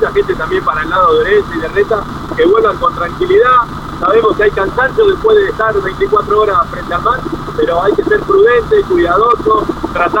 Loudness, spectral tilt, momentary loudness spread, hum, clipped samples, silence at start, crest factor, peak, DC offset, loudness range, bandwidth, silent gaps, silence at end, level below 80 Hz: -11 LUFS; -6.5 dB/octave; 7 LU; none; under 0.1%; 0 s; 12 dB; 0 dBFS; under 0.1%; 1 LU; 16 kHz; none; 0 s; -30 dBFS